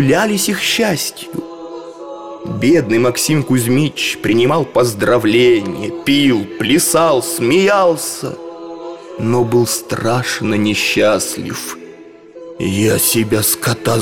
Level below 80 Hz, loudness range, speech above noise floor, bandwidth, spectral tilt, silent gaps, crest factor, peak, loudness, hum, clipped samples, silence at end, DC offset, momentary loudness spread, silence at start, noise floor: -48 dBFS; 3 LU; 23 dB; 17.5 kHz; -4 dB/octave; none; 12 dB; -2 dBFS; -14 LUFS; none; under 0.1%; 0 s; under 0.1%; 17 LU; 0 s; -37 dBFS